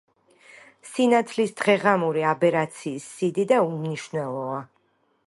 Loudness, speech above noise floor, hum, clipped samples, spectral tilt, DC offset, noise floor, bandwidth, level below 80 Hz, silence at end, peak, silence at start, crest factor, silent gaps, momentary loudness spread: -24 LUFS; 44 dB; none; under 0.1%; -5.5 dB/octave; under 0.1%; -67 dBFS; 11.5 kHz; -72 dBFS; 0.65 s; -6 dBFS; 0.85 s; 18 dB; none; 12 LU